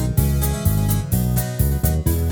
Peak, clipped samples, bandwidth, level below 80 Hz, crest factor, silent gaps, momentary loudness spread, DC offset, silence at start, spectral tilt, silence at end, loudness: -4 dBFS; under 0.1%; over 20 kHz; -24 dBFS; 16 dB; none; 1 LU; under 0.1%; 0 s; -6 dB/octave; 0 s; -20 LUFS